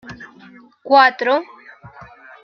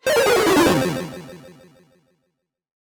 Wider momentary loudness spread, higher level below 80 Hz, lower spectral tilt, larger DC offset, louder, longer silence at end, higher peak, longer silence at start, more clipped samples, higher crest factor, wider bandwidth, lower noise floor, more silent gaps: first, 25 LU vs 21 LU; second, -60 dBFS vs -50 dBFS; about the same, -4.5 dB/octave vs -4 dB/octave; neither; about the same, -15 LUFS vs -17 LUFS; second, 1 s vs 1.35 s; first, 0 dBFS vs -6 dBFS; about the same, 0.1 s vs 0.05 s; neither; about the same, 18 dB vs 16 dB; second, 6.6 kHz vs over 20 kHz; second, -45 dBFS vs -75 dBFS; neither